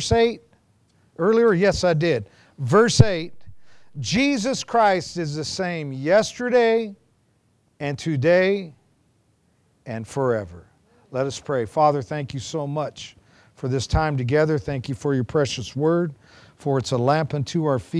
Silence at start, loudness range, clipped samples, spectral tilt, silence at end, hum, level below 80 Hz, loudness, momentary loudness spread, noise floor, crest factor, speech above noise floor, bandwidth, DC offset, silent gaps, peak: 0 s; 5 LU; under 0.1%; -5.5 dB/octave; 0 s; none; -44 dBFS; -22 LUFS; 14 LU; -64 dBFS; 22 dB; 43 dB; 11 kHz; under 0.1%; none; 0 dBFS